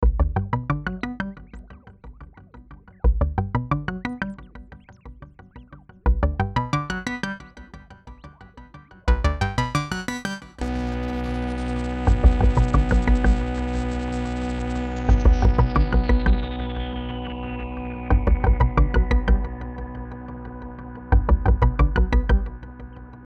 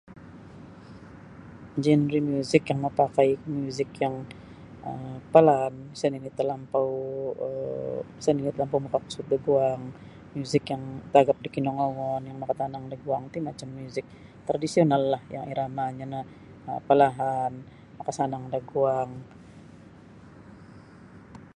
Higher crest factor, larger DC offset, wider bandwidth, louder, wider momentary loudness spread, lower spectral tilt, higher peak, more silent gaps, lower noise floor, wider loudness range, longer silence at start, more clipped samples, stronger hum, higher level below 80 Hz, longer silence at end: about the same, 20 dB vs 24 dB; neither; second, 8.4 kHz vs 11.5 kHz; first, -24 LUFS vs -27 LUFS; second, 18 LU vs 24 LU; about the same, -7 dB/octave vs -7 dB/octave; about the same, -2 dBFS vs -2 dBFS; neither; second, -45 dBFS vs -49 dBFS; about the same, 6 LU vs 5 LU; about the same, 0 s vs 0.1 s; neither; neither; first, -24 dBFS vs -60 dBFS; about the same, 0.05 s vs 0.05 s